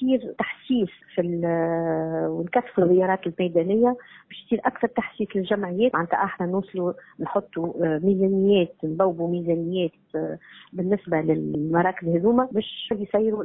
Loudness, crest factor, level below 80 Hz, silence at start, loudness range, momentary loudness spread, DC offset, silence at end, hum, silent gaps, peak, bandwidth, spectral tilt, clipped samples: -24 LUFS; 16 dB; -62 dBFS; 0 s; 2 LU; 9 LU; under 0.1%; 0 s; none; none; -8 dBFS; 4 kHz; -11.5 dB/octave; under 0.1%